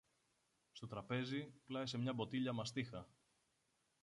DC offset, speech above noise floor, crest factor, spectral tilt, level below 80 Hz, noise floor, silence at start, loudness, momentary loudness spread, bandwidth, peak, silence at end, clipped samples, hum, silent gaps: under 0.1%; 38 dB; 18 dB; -5.5 dB/octave; -78 dBFS; -83 dBFS; 0.75 s; -45 LUFS; 14 LU; 11 kHz; -28 dBFS; 0.95 s; under 0.1%; none; none